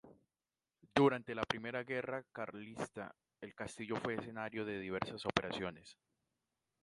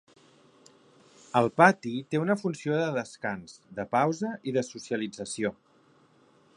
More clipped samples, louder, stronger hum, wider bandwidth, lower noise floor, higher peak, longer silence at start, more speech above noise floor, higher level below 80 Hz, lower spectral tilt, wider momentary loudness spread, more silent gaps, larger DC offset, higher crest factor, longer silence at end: neither; second, -40 LUFS vs -28 LUFS; neither; about the same, 11.5 kHz vs 11 kHz; first, under -90 dBFS vs -62 dBFS; second, -12 dBFS vs -4 dBFS; second, 0.05 s vs 1.35 s; first, over 50 dB vs 34 dB; about the same, -70 dBFS vs -70 dBFS; about the same, -5.5 dB/octave vs -5.5 dB/octave; about the same, 15 LU vs 14 LU; neither; neither; about the same, 30 dB vs 26 dB; second, 0.9 s vs 1.05 s